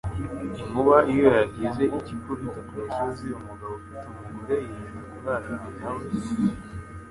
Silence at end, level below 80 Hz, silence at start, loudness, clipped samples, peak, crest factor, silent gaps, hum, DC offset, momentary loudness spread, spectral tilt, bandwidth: 0 s; -46 dBFS; 0.05 s; -26 LUFS; under 0.1%; -4 dBFS; 22 dB; none; none; under 0.1%; 19 LU; -7.5 dB/octave; 11.5 kHz